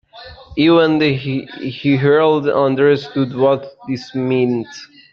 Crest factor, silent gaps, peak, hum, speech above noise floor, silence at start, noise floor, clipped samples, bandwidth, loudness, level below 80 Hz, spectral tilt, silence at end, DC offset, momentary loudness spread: 14 dB; none; -2 dBFS; none; 23 dB; 0.15 s; -38 dBFS; under 0.1%; 7 kHz; -16 LUFS; -52 dBFS; -7.5 dB/octave; 0.25 s; under 0.1%; 14 LU